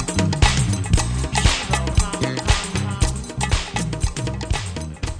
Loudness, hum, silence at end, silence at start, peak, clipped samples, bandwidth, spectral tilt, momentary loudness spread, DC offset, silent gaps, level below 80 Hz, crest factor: -21 LUFS; none; 0 s; 0 s; -2 dBFS; under 0.1%; 11 kHz; -4 dB/octave; 8 LU; under 0.1%; none; -26 dBFS; 18 dB